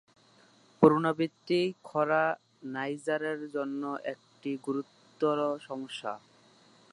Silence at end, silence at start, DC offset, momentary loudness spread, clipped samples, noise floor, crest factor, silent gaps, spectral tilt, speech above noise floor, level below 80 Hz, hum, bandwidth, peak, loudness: 0.75 s; 0.8 s; under 0.1%; 16 LU; under 0.1%; -62 dBFS; 26 dB; none; -6.5 dB/octave; 32 dB; -74 dBFS; none; 11.5 kHz; -6 dBFS; -31 LUFS